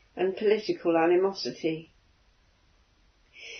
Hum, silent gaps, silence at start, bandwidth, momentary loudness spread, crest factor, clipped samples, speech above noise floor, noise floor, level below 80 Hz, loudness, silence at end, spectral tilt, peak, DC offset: none; none; 0.15 s; 6.6 kHz; 11 LU; 18 dB; under 0.1%; 38 dB; -64 dBFS; -68 dBFS; -27 LUFS; 0 s; -5.5 dB/octave; -12 dBFS; under 0.1%